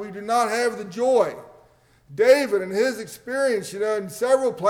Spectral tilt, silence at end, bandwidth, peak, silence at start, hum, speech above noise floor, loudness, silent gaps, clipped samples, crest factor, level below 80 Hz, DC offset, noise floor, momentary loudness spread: -4 dB/octave; 0 s; 17.5 kHz; -6 dBFS; 0 s; none; 35 dB; -22 LUFS; none; under 0.1%; 16 dB; -66 dBFS; under 0.1%; -56 dBFS; 10 LU